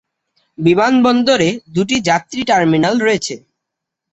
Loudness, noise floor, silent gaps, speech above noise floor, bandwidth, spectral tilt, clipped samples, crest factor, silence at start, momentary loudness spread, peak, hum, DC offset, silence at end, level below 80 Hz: -14 LUFS; -79 dBFS; none; 66 dB; 8.2 kHz; -5 dB/octave; under 0.1%; 14 dB; 0.6 s; 8 LU; 0 dBFS; none; under 0.1%; 0.75 s; -52 dBFS